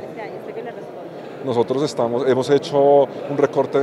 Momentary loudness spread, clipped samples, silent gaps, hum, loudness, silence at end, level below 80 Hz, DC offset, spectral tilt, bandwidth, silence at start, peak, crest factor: 18 LU; under 0.1%; none; none; -18 LUFS; 0 s; -70 dBFS; under 0.1%; -6 dB/octave; 11.5 kHz; 0 s; -4 dBFS; 16 dB